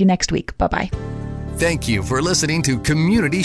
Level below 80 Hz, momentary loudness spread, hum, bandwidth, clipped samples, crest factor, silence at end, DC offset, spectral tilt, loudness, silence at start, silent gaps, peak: -32 dBFS; 11 LU; none; 11 kHz; under 0.1%; 14 dB; 0 s; under 0.1%; -4.5 dB/octave; -19 LUFS; 0 s; none; -4 dBFS